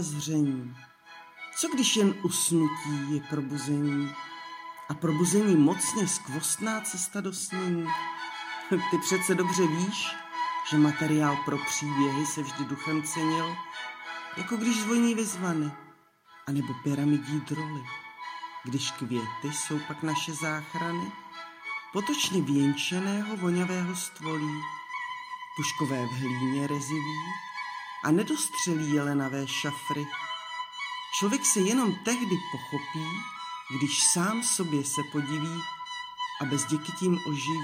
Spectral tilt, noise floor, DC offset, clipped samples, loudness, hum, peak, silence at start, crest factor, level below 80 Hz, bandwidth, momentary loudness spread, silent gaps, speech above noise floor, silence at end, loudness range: -4 dB/octave; -57 dBFS; under 0.1%; under 0.1%; -29 LUFS; none; -10 dBFS; 0 s; 20 dB; -74 dBFS; 16 kHz; 12 LU; none; 28 dB; 0 s; 5 LU